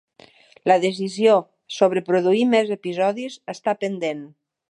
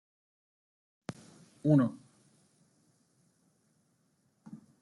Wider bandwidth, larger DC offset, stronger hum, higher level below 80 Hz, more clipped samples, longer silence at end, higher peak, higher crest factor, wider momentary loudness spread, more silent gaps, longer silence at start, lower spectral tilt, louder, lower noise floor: about the same, 11 kHz vs 11.5 kHz; neither; neither; about the same, -76 dBFS vs -80 dBFS; neither; first, 0.45 s vs 0.25 s; first, -4 dBFS vs -14 dBFS; second, 18 dB vs 24 dB; second, 11 LU vs 27 LU; neither; second, 0.65 s vs 1.65 s; second, -5.5 dB/octave vs -9 dB/octave; first, -21 LUFS vs -29 LUFS; second, -51 dBFS vs -74 dBFS